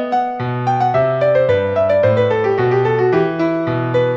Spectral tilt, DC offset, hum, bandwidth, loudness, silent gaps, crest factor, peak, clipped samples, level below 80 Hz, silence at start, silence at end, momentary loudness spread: -8.5 dB/octave; under 0.1%; none; 7.2 kHz; -16 LUFS; none; 12 dB; -2 dBFS; under 0.1%; -52 dBFS; 0 s; 0 s; 5 LU